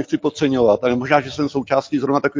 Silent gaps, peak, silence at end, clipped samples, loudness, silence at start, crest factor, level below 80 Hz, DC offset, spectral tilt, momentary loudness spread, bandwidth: none; 0 dBFS; 0 s; under 0.1%; -18 LUFS; 0 s; 18 dB; -52 dBFS; under 0.1%; -6 dB/octave; 6 LU; 7.6 kHz